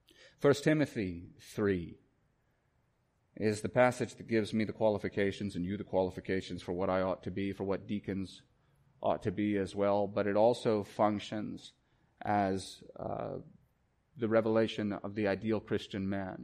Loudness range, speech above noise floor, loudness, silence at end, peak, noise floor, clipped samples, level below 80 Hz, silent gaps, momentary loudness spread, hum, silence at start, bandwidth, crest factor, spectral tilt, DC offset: 4 LU; 42 dB; -33 LUFS; 0 s; -14 dBFS; -75 dBFS; under 0.1%; -66 dBFS; none; 12 LU; none; 0.4 s; 15 kHz; 20 dB; -6.5 dB/octave; under 0.1%